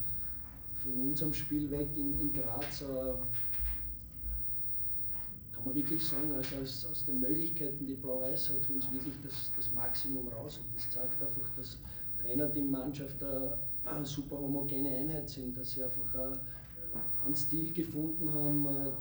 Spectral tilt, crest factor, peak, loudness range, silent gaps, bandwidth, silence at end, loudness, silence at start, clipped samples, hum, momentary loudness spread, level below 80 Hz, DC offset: -6.5 dB/octave; 14 dB; -22 dBFS; 2 LU; none; over 20 kHz; 0 s; -33 LUFS; 0 s; under 0.1%; none; 9 LU; -52 dBFS; under 0.1%